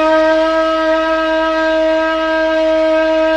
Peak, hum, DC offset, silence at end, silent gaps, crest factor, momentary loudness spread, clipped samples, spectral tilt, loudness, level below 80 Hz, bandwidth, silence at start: -2 dBFS; none; under 0.1%; 0 s; none; 10 dB; 2 LU; under 0.1%; -4 dB/octave; -13 LUFS; -40 dBFS; 8.6 kHz; 0 s